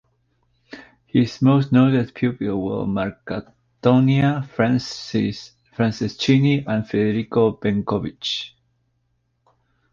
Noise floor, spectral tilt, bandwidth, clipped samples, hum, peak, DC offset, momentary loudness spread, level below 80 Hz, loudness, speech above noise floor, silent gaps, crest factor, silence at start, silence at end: -69 dBFS; -7 dB/octave; 7.4 kHz; under 0.1%; none; -2 dBFS; under 0.1%; 10 LU; -52 dBFS; -20 LUFS; 50 dB; none; 18 dB; 0.7 s; 1.45 s